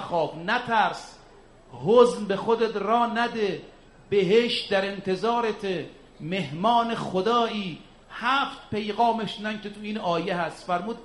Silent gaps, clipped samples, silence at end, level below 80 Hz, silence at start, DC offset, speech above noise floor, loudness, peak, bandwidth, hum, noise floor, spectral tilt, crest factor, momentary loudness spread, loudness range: none; under 0.1%; 0 s; -58 dBFS; 0 s; under 0.1%; 27 dB; -25 LUFS; -6 dBFS; 11.5 kHz; none; -51 dBFS; -5.5 dB/octave; 20 dB; 12 LU; 3 LU